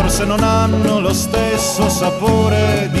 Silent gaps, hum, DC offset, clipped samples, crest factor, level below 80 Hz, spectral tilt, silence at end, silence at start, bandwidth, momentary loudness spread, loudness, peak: none; none; under 0.1%; under 0.1%; 12 dB; -28 dBFS; -5 dB/octave; 0 s; 0 s; 13 kHz; 2 LU; -15 LUFS; -2 dBFS